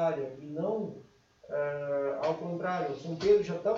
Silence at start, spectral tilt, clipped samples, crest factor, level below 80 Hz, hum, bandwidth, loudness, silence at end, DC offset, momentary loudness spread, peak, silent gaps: 0 s; -7 dB/octave; under 0.1%; 18 dB; -66 dBFS; none; 7.4 kHz; -32 LUFS; 0 s; under 0.1%; 12 LU; -14 dBFS; none